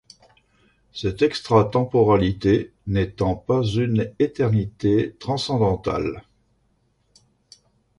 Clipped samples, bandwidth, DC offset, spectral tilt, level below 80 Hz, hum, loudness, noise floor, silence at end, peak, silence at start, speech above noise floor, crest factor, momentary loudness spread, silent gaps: under 0.1%; 11.5 kHz; under 0.1%; -7.5 dB/octave; -44 dBFS; none; -22 LUFS; -66 dBFS; 1.8 s; -4 dBFS; 0.95 s; 45 dB; 18 dB; 8 LU; none